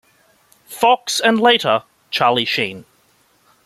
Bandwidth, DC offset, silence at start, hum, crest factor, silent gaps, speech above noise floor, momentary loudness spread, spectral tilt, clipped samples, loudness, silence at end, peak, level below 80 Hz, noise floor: 15.5 kHz; under 0.1%; 0.7 s; none; 18 dB; none; 42 dB; 10 LU; -3 dB/octave; under 0.1%; -16 LUFS; 0.85 s; -2 dBFS; -64 dBFS; -58 dBFS